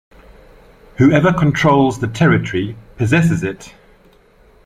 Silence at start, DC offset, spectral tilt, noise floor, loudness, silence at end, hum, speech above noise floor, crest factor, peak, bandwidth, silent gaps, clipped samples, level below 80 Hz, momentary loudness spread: 1 s; under 0.1%; -7 dB/octave; -49 dBFS; -15 LUFS; 0.95 s; none; 35 dB; 16 dB; -2 dBFS; 11.5 kHz; none; under 0.1%; -42 dBFS; 11 LU